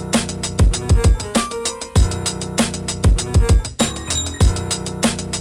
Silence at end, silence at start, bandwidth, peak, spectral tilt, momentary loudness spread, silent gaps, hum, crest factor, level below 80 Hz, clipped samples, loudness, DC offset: 0 s; 0 s; 15 kHz; -2 dBFS; -4.5 dB/octave; 6 LU; none; none; 14 dB; -20 dBFS; under 0.1%; -18 LUFS; under 0.1%